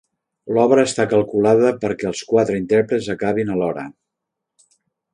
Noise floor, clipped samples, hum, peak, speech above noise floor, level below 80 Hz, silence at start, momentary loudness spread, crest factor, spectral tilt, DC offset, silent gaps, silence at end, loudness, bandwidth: -81 dBFS; under 0.1%; none; -2 dBFS; 64 dB; -56 dBFS; 0.45 s; 9 LU; 18 dB; -5.5 dB/octave; under 0.1%; none; 1.25 s; -18 LUFS; 10.5 kHz